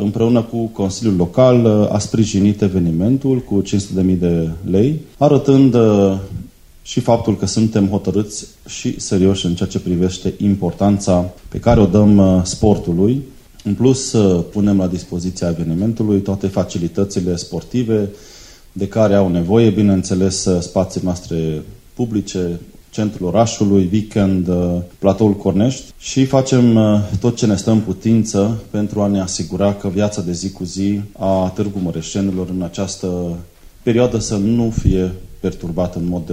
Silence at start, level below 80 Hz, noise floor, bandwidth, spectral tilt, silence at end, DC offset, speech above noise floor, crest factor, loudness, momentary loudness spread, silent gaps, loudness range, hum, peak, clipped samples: 0 s; -36 dBFS; -36 dBFS; 15 kHz; -6.5 dB/octave; 0 s; under 0.1%; 21 dB; 16 dB; -16 LUFS; 11 LU; none; 5 LU; none; 0 dBFS; under 0.1%